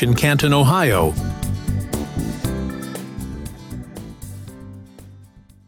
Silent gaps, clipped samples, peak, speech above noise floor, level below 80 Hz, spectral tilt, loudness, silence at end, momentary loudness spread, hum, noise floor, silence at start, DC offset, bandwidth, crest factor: none; under 0.1%; -6 dBFS; 30 dB; -34 dBFS; -5.5 dB/octave; -20 LUFS; 0.25 s; 21 LU; none; -46 dBFS; 0 s; under 0.1%; 19 kHz; 16 dB